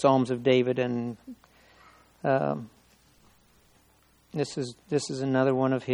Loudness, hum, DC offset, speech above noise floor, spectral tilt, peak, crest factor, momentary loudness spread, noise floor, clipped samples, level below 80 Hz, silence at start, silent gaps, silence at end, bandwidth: -27 LUFS; none; under 0.1%; 37 dB; -6 dB/octave; -8 dBFS; 20 dB; 14 LU; -63 dBFS; under 0.1%; -68 dBFS; 0 s; none; 0 s; 11 kHz